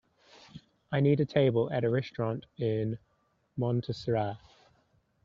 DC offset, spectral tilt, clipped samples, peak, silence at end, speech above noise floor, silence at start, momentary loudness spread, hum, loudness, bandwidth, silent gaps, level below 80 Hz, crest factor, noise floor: under 0.1%; -7 dB/octave; under 0.1%; -12 dBFS; 0.9 s; 41 dB; 0.55 s; 17 LU; none; -30 LUFS; 7.2 kHz; none; -64 dBFS; 20 dB; -70 dBFS